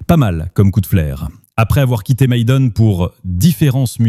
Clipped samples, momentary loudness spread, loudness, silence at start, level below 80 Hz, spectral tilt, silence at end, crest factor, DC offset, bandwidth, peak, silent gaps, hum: under 0.1%; 7 LU; -14 LUFS; 0 s; -30 dBFS; -7 dB/octave; 0 s; 12 dB; under 0.1%; 15.5 kHz; 0 dBFS; none; none